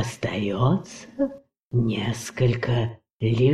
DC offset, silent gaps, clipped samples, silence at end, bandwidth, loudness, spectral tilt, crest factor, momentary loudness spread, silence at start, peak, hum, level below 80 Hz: under 0.1%; 1.59-1.71 s, 3.13-3.19 s; under 0.1%; 0 s; 12.5 kHz; -25 LUFS; -6.5 dB/octave; 16 dB; 7 LU; 0 s; -8 dBFS; none; -46 dBFS